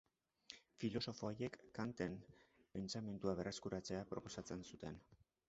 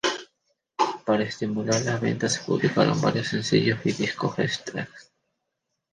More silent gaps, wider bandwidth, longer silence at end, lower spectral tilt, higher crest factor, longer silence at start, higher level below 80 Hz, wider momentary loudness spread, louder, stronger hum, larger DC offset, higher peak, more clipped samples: neither; second, 8 kHz vs 10 kHz; second, 0.35 s vs 0.9 s; about the same, -5 dB/octave vs -5 dB/octave; about the same, 22 dB vs 20 dB; first, 0.5 s vs 0.05 s; second, -70 dBFS vs -62 dBFS; first, 13 LU vs 10 LU; second, -48 LUFS vs -25 LUFS; neither; neither; second, -26 dBFS vs -6 dBFS; neither